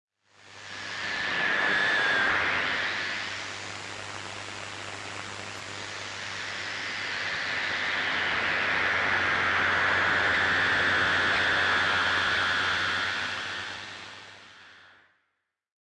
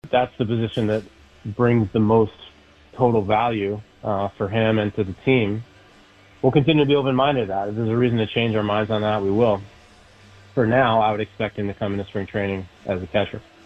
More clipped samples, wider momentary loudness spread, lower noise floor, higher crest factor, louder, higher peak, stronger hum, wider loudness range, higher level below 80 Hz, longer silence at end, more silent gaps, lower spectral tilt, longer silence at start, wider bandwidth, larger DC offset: neither; first, 14 LU vs 10 LU; first, -80 dBFS vs -50 dBFS; about the same, 16 dB vs 18 dB; second, -26 LUFS vs -21 LUFS; second, -12 dBFS vs -4 dBFS; neither; first, 11 LU vs 3 LU; second, -62 dBFS vs -50 dBFS; first, 1.05 s vs 0.25 s; neither; second, -2 dB/octave vs -8.5 dB/octave; first, 0.45 s vs 0.05 s; first, 11.5 kHz vs 8 kHz; neither